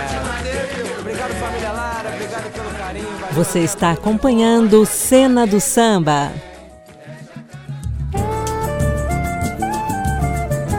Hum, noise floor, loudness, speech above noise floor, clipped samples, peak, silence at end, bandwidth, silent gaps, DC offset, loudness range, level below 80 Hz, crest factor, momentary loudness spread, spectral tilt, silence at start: none; -40 dBFS; -18 LUFS; 24 dB; under 0.1%; -2 dBFS; 0 s; 17.5 kHz; none; under 0.1%; 9 LU; -32 dBFS; 16 dB; 15 LU; -5 dB/octave; 0 s